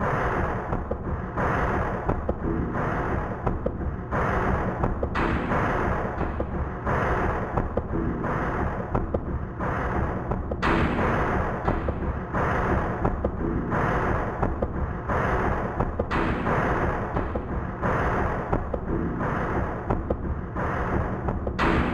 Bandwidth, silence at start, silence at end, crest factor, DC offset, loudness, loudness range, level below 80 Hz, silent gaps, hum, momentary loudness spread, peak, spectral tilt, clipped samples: 10 kHz; 0 s; 0 s; 18 dB; under 0.1%; -27 LUFS; 2 LU; -32 dBFS; none; none; 5 LU; -6 dBFS; -8 dB/octave; under 0.1%